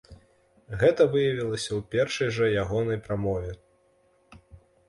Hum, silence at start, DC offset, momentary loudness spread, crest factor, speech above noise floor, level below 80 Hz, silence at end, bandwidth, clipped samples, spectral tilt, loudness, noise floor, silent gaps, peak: none; 0.1 s; under 0.1%; 11 LU; 20 dB; 39 dB; -50 dBFS; 0.3 s; 11.5 kHz; under 0.1%; -5.5 dB/octave; -26 LUFS; -64 dBFS; none; -8 dBFS